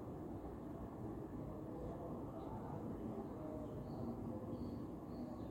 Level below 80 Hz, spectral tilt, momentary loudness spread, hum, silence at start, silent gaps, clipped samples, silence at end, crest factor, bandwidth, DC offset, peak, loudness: -60 dBFS; -9 dB/octave; 3 LU; none; 0 s; none; under 0.1%; 0 s; 12 dB; 16.5 kHz; under 0.1%; -34 dBFS; -48 LUFS